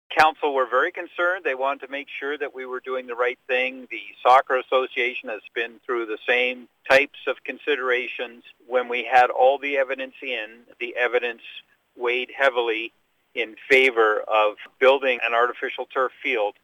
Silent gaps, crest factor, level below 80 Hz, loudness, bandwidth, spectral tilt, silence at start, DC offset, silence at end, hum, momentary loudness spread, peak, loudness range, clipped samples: none; 18 dB; -70 dBFS; -22 LUFS; 14.5 kHz; -3 dB/octave; 0.1 s; under 0.1%; 0.15 s; none; 13 LU; -6 dBFS; 5 LU; under 0.1%